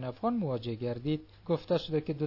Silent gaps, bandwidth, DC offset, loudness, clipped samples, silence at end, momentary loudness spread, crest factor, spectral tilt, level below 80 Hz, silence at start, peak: none; 6 kHz; under 0.1%; -33 LUFS; under 0.1%; 0 s; 5 LU; 16 dB; -9 dB/octave; -60 dBFS; 0 s; -18 dBFS